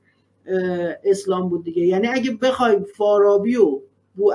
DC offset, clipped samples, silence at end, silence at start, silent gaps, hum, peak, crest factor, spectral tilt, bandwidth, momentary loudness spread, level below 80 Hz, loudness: under 0.1%; under 0.1%; 0 s; 0.45 s; none; none; -4 dBFS; 16 dB; -6 dB/octave; 11.5 kHz; 7 LU; -66 dBFS; -19 LUFS